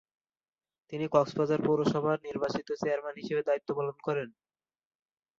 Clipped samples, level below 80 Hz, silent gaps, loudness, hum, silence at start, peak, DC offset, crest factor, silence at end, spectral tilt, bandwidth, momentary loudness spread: under 0.1%; -70 dBFS; none; -31 LUFS; none; 0.9 s; -12 dBFS; under 0.1%; 20 dB; 1.1 s; -7 dB/octave; 7.6 kHz; 7 LU